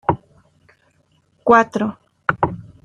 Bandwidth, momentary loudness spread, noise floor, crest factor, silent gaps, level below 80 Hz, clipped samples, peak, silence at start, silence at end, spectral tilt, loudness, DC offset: 10 kHz; 11 LU; -61 dBFS; 20 dB; none; -50 dBFS; under 0.1%; -2 dBFS; 0.1 s; 0.2 s; -7 dB/octave; -19 LUFS; under 0.1%